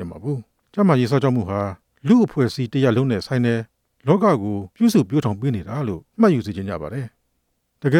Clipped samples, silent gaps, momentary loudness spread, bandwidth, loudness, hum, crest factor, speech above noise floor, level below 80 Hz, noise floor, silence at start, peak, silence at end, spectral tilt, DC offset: under 0.1%; none; 12 LU; 15 kHz; -20 LUFS; none; 16 dB; 51 dB; -54 dBFS; -70 dBFS; 0 s; -2 dBFS; 0 s; -7.5 dB/octave; under 0.1%